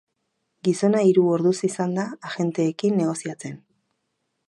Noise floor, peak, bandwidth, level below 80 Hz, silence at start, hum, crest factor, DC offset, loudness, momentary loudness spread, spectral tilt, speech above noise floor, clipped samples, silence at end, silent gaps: -76 dBFS; -6 dBFS; 11.5 kHz; -74 dBFS; 0.65 s; none; 16 dB; under 0.1%; -22 LUFS; 13 LU; -6.5 dB/octave; 54 dB; under 0.1%; 0.9 s; none